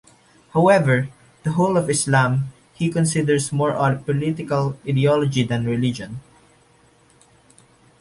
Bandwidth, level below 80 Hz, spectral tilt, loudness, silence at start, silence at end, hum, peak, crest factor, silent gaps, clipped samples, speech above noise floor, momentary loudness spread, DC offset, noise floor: 11.5 kHz; -54 dBFS; -6 dB/octave; -20 LUFS; 0.55 s; 1.8 s; none; -4 dBFS; 18 dB; none; under 0.1%; 36 dB; 10 LU; under 0.1%; -55 dBFS